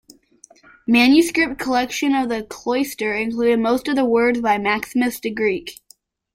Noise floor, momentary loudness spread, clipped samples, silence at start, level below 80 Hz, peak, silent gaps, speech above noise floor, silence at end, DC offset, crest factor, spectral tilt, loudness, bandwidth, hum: -54 dBFS; 9 LU; under 0.1%; 0.9 s; -54 dBFS; -2 dBFS; none; 36 dB; 0.6 s; under 0.1%; 18 dB; -4 dB/octave; -19 LUFS; 16.5 kHz; none